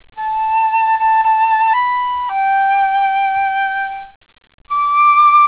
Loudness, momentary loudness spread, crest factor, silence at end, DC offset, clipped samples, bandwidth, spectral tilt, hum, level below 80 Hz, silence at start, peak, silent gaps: -14 LUFS; 9 LU; 10 dB; 0 s; 0.1%; under 0.1%; 4 kHz; -3.5 dB/octave; none; -54 dBFS; 0.15 s; -4 dBFS; 4.16-4.21 s, 4.54-4.58 s